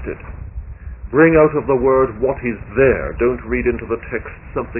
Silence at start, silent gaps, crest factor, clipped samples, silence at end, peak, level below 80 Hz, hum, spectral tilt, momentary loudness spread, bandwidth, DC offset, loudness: 0 s; none; 16 dB; under 0.1%; 0 s; 0 dBFS; -32 dBFS; none; -12.5 dB/octave; 20 LU; 3 kHz; under 0.1%; -17 LUFS